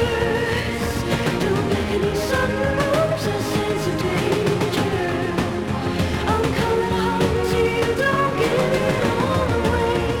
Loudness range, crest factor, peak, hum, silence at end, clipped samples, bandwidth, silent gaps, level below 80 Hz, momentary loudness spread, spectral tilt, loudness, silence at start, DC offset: 2 LU; 14 dB; -6 dBFS; none; 0 s; under 0.1%; 17.5 kHz; none; -36 dBFS; 3 LU; -5.5 dB/octave; -21 LUFS; 0 s; under 0.1%